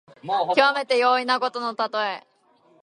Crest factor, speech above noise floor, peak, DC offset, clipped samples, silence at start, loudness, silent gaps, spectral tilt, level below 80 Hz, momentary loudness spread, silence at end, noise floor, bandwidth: 22 dB; 37 dB; 0 dBFS; under 0.1%; under 0.1%; 0.25 s; -22 LUFS; none; -3 dB/octave; -76 dBFS; 8 LU; 0.6 s; -59 dBFS; 11.5 kHz